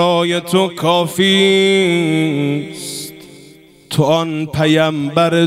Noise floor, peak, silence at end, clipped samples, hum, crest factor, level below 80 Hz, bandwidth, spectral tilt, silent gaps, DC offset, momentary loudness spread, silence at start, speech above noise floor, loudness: -43 dBFS; 0 dBFS; 0 s; under 0.1%; none; 14 dB; -52 dBFS; 16 kHz; -5 dB/octave; none; under 0.1%; 12 LU; 0 s; 29 dB; -14 LUFS